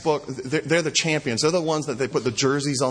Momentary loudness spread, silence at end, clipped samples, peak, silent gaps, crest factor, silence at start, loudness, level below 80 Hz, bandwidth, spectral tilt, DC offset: 5 LU; 0 s; under 0.1%; -6 dBFS; none; 16 dB; 0 s; -23 LUFS; -58 dBFS; 10.5 kHz; -4 dB/octave; under 0.1%